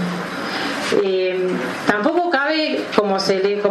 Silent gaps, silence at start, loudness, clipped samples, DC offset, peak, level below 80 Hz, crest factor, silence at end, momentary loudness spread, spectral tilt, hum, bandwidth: none; 0 s; -19 LUFS; under 0.1%; under 0.1%; 0 dBFS; -62 dBFS; 18 dB; 0 s; 5 LU; -4.5 dB/octave; none; 13 kHz